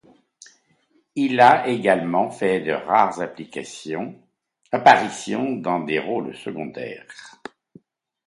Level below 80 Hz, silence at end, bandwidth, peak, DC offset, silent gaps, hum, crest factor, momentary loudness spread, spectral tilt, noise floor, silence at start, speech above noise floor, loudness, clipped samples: -66 dBFS; 1 s; 11.5 kHz; 0 dBFS; under 0.1%; none; none; 22 dB; 20 LU; -5 dB/octave; -64 dBFS; 1.15 s; 43 dB; -20 LUFS; under 0.1%